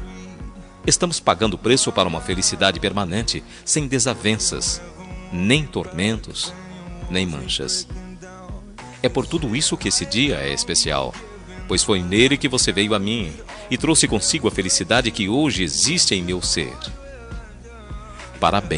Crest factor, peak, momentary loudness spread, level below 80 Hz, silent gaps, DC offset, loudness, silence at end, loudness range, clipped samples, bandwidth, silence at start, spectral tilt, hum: 20 dB; -2 dBFS; 20 LU; -38 dBFS; none; under 0.1%; -19 LUFS; 0 s; 5 LU; under 0.1%; 11 kHz; 0 s; -3 dB/octave; none